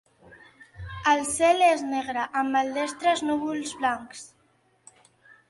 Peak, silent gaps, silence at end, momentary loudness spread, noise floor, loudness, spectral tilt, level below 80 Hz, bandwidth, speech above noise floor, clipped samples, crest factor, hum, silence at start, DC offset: -8 dBFS; none; 1.25 s; 16 LU; -65 dBFS; -25 LUFS; -3 dB/octave; -56 dBFS; 11.5 kHz; 41 dB; under 0.1%; 18 dB; none; 0.3 s; under 0.1%